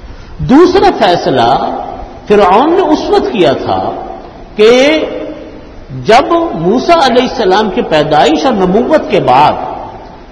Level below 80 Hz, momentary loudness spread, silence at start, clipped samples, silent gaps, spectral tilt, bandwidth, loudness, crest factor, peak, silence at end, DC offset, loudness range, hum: -34 dBFS; 17 LU; 0 s; 2%; none; -5.5 dB/octave; 12 kHz; -9 LUFS; 10 dB; 0 dBFS; 0 s; under 0.1%; 2 LU; none